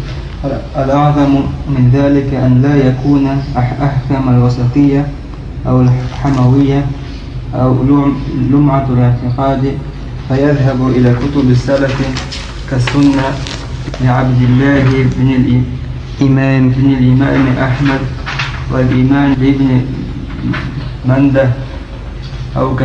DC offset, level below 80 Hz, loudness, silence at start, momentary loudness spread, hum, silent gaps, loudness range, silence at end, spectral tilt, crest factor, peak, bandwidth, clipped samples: under 0.1%; -26 dBFS; -12 LUFS; 0 s; 12 LU; none; none; 2 LU; 0 s; -8 dB/octave; 12 dB; 0 dBFS; 8 kHz; under 0.1%